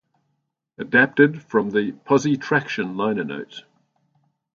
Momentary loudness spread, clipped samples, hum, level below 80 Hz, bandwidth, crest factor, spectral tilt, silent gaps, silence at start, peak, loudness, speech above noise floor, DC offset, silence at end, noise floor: 16 LU; under 0.1%; none; -68 dBFS; 7.2 kHz; 22 dB; -6 dB/octave; none; 0.8 s; 0 dBFS; -20 LUFS; 54 dB; under 0.1%; 0.95 s; -74 dBFS